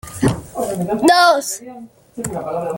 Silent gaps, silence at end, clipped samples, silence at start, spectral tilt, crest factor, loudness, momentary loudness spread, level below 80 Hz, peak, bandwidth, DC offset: none; 0 s; under 0.1%; 0.05 s; -4.5 dB/octave; 16 dB; -17 LUFS; 17 LU; -46 dBFS; -2 dBFS; 17 kHz; under 0.1%